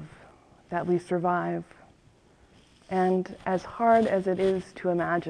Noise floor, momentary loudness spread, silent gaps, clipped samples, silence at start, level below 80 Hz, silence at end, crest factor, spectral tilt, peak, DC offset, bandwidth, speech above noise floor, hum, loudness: -59 dBFS; 10 LU; none; under 0.1%; 0 s; -60 dBFS; 0 s; 18 dB; -7.5 dB/octave; -10 dBFS; under 0.1%; 10 kHz; 33 dB; none; -27 LUFS